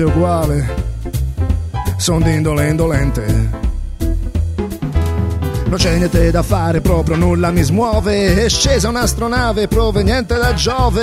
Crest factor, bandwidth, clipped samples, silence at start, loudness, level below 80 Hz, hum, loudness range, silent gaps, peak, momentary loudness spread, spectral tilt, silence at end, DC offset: 14 dB; 16 kHz; under 0.1%; 0 s; -15 LUFS; -20 dBFS; none; 4 LU; none; 0 dBFS; 8 LU; -5.5 dB/octave; 0 s; under 0.1%